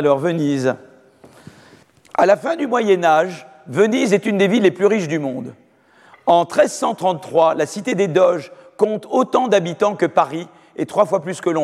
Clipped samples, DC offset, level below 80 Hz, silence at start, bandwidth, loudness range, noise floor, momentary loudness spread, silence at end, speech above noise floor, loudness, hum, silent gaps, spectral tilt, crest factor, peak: under 0.1%; under 0.1%; -68 dBFS; 0 s; 13 kHz; 2 LU; -50 dBFS; 11 LU; 0 s; 34 dB; -18 LUFS; none; none; -5.5 dB/octave; 16 dB; -2 dBFS